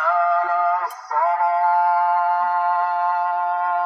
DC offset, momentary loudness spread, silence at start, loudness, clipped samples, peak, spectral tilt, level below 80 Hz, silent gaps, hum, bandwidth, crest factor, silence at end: under 0.1%; 4 LU; 0 s; -19 LUFS; under 0.1%; -8 dBFS; 0.5 dB/octave; under -90 dBFS; none; none; 13 kHz; 10 dB; 0 s